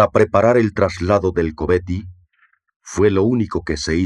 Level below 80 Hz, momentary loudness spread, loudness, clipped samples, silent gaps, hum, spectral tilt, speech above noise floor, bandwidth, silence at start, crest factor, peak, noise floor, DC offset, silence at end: -40 dBFS; 8 LU; -18 LUFS; under 0.1%; 2.76-2.80 s; none; -6.5 dB/octave; 44 dB; 11 kHz; 0 s; 16 dB; -2 dBFS; -60 dBFS; under 0.1%; 0 s